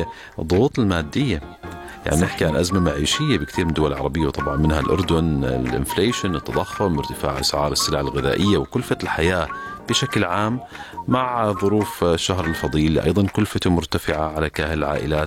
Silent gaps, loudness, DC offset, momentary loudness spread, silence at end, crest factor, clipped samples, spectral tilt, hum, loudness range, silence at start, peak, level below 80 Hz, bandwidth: none; -21 LUFS; under 0.1%; 5 LU; 0 s; 16 dB; under 0.1%; -5 dB/octave; none; 1 LU; 0 s; -6 dBFS; -34 dBFS; 17 kHz